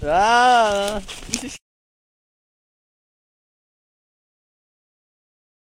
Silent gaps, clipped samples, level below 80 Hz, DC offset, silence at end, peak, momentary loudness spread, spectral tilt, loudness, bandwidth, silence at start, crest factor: none; under 0.1%; -46 dBFS; under 0.1%; 4.05 s; -2 dBFS; 15 LU; -2.5 dB/octave; -18 LUFS; 16 kHz; 0 s; 22 dB